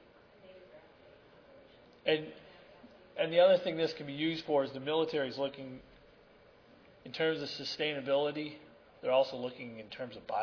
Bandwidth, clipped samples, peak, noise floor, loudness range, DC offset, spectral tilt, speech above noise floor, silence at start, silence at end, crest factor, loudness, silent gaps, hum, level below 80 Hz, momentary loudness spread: 5.4 kHz; under 0.1%; -16 dBFS; -61 dBFS; 5 LU; under 0.1%; -5.5 dB/octave; 28 dB; 0.45 s; 0 s; 20 dB; -33 LUFS; none; none; -74 dBFS; 19 LU